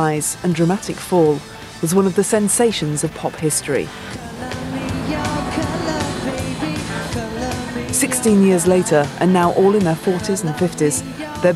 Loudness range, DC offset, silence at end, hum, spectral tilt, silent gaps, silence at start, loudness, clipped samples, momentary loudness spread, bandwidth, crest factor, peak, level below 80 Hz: 7 LU; under 0.1%; 0 s; none; -5 dB/octave; none; 0 s; -18 LUFS; under 0.1%; 10 LU; 14.5 kHz; 16 dB; -2 dBFS; -42 dBFS